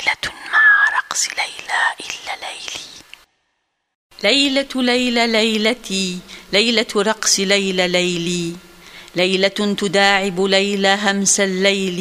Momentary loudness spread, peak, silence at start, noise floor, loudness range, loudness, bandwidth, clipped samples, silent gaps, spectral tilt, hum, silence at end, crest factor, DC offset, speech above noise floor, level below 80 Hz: 13 LU; 0 dBFS; 0 s; -71 dBFS; 5 LU; -16 LUFS; 15.5 kHz; under 0.1%; 3.95-4.10 s; -2.5 dB/octave; none; 0 s; 18 dB; under 0.1%; 54 dB; -54 dBFS